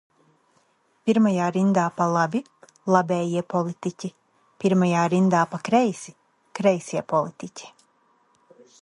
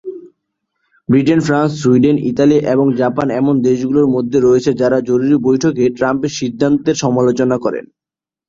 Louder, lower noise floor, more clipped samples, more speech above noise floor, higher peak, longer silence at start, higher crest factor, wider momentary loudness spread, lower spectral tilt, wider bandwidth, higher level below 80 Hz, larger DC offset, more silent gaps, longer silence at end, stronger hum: second, -23 LUFS vs -14 LUFS; second, -65 dBFS vs -89 dBFS; neither; second, 43 dB vs 76 dB; about the same, -4 dBFS vs -2 dBFS; first, 1.05 s vs 0.05 s; first, 20 dB vs 12 dB; first, 16 LU vs 5 LU; about the same, -6.5 dB/octave vs -6.5 dB/octave; first, 11 kHz vs 7.8 kHz; second, -70 dBFS vs -50 dBFS; neither; neither; first, 1.15 s vs 0.65 s; neither